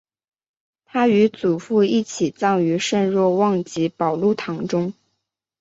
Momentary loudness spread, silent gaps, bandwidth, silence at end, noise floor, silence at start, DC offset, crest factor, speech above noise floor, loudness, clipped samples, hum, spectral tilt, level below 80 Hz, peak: 7 LU; none; 8 kHz; 0.7 s; -77 dBFS; 0.95 s; under 0.1%; 16 dB; 58 dB; -20 LUFS; under 0.1%; none; -6 dB/octave; -64 dBFS; -4 dBFS